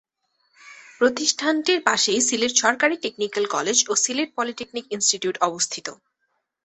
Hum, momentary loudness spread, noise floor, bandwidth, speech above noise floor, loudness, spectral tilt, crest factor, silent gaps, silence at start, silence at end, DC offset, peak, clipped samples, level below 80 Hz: none; 9 LU; -74 dBFS; 8.6 kHz; 52 dB; -21 LUFS; -0.5 dB/octave; 22 dB; none; 0.65 s; 0.7 s; under 0.1%; -2 dBFS; under 0.1%; -68 dBFS